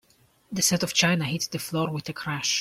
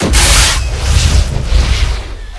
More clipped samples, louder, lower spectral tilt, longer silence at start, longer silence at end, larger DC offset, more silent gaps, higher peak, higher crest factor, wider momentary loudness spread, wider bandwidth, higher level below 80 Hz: second, under 0.1% vs 0.3%; second, -25 LUFS vs -11 LUFS; about the same, -3 dB/octave vs -3 dB/octave; first, 0.5 s vs 0 s; about the same, 0 s vs 0 s; neither; neither; second, -8 dBFS vs 0 dBFS; first, 20 dB vs 10 dB; about the same, 10 LU vs 9 LU; first, 16.5 kHz vs 11 kHz; second, -62 dBFS vs -12 dBFS